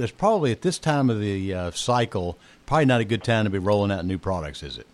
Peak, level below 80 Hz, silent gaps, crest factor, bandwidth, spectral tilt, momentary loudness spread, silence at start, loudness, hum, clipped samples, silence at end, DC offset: -8 dBFS; -48 dBFS; none; 16 dB; 12.5 kHz; -6 dB/octave; 9 LU; 0 s; -24 LUFS; none; under 0.1%; 0.1 s; under 0.1%